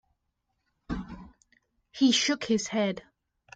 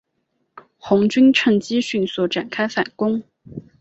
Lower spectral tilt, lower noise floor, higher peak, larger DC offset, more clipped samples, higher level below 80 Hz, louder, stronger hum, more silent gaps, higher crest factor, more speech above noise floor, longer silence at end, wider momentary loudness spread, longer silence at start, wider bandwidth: second, -3.5 dB/octave vs -5.5 dB/octave; first, -79 dBFS vs -71 dBFS; second, -12 dBFS vs -4 dBFS; neither; neither; first, -54 dBFS vs -60 dBFS; second, -27 LUFS vs -19 LUFS; neither; neither; about the same, 18 dB vs 16 dB; about the same, 53 dB vs 53 dB; first, 0.55 s vs 0.2 s; about the same, 22 LU vs 24 LU; first, 0.9 s vs 0.55 s; first, 9.4 kHz vs 8.2 kHz